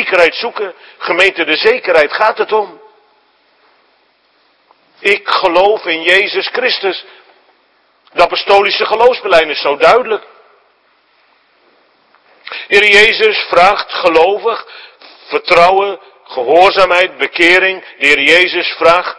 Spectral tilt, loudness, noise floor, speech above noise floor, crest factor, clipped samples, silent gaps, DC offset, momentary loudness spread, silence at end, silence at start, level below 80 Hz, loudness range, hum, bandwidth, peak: -2.5 dB/octave; -10 LUFS; -54 dBFS; 44 dB; 12 dB; 1%; none; under 0.1%; 13 LU; 0.05 s; 0 s; -48 dBFS; 7 LU; none; 11 kHz; 0 dBFS